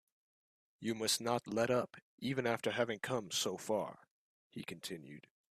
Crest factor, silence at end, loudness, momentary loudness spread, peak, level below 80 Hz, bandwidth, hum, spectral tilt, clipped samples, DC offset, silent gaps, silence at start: 20 dB; 0.35 s; -38 LUFS; 14 LU; -18 dBFS; -78 dBFS; 15.5 kHz; none; -3.5 dB/octave; under 0.1%; under 0.1%; 2.02-2.18 s, 4.11-4.50 s; 0.8 s